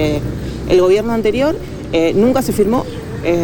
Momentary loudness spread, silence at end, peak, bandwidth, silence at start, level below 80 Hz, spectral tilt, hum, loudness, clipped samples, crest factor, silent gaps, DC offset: 11 LU; 0 s; -2 dBFS; 19 kHz; 0 s; -32 dBFS; -6.5 dB/octave; none; -15 LUFS; under 0.1%; 12 dB; none; under 0.1%